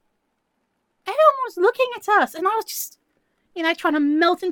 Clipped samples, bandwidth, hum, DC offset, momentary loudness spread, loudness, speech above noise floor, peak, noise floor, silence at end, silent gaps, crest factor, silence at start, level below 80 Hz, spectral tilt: under 0.1%; 17.5 kHz; none; under 0.1%; 12 LU; -20 LUFS; 52 dB; -2 dBFS; -73 dBFS; 0 s; none; 20 dB; 1.05 s; -74 dBFS; -2 dB/octave